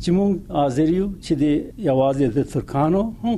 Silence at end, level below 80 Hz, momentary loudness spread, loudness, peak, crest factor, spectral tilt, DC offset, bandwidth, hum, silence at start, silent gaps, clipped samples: 0 s; -40 dBFS; 4 LU; -21 LUFS; -6 dBFS; 14 dB; -8 dB/octave; under 0.1%; 12 kHz; none; 0 s; none; under 0.1%